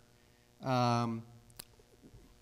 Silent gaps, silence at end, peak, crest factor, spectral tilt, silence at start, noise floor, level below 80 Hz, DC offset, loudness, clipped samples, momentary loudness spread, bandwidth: none; 0.25 s; -20 dBFS; 18 dB; -6.5 dB/octave; 0.6 s; -65 dBFS; -68 dBFS; under 0.1%; -34 LUFS; under 0.1%; 23 LU; 16 kHz